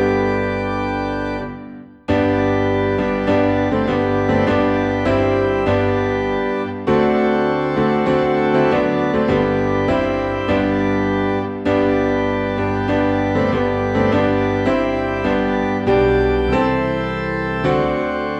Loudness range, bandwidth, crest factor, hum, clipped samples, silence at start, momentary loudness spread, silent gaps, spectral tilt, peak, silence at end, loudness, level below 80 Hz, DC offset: 1 LU; 8.2 kHz; 14 dB; none; under 0.1%; 0 s; 5 LU; none; -7.5 dB/octave; -4 dBFS; 0 s; -18 LUFS; -36 dBFS; under 0.1%